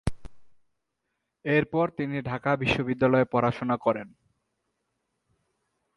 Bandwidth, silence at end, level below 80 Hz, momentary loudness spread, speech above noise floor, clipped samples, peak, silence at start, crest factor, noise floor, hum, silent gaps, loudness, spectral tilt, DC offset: 11.5 kHz; 1.9 s; -50 dBFS; 9 LU; 55 dB; under 0.1%; -10 dBFS; 0.05 s; 20 dB; -81 dBFS; none; none; -26 LUFS; -7.5 dB/octave; under 0.1%